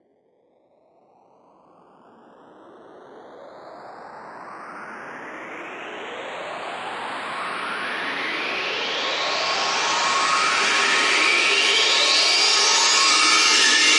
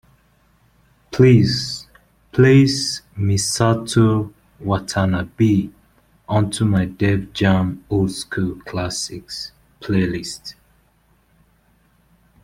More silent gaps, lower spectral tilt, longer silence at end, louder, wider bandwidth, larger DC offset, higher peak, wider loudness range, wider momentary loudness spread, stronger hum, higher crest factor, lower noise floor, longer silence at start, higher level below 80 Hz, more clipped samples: neither; second, 1.5 dB/octave vs -5.5 dB/octave; second, 0 s vs 1.9 s; about the same, -18 LUFS vs -19 LUFS; second, 11.5 kHz vs 15.5 kHz; neither; second, -4 dBFS vs 0 dBFS; first, 22 LU vs 9 LU; first, 22 LU vs 17 LU; neither; about the same, 18 dB vs 18 dB; about the same, -62 dBFS vs -59 dBFS; first, 2.8 s vs 1.1 s; second, -76 dBFS vs -46 dBFS; neither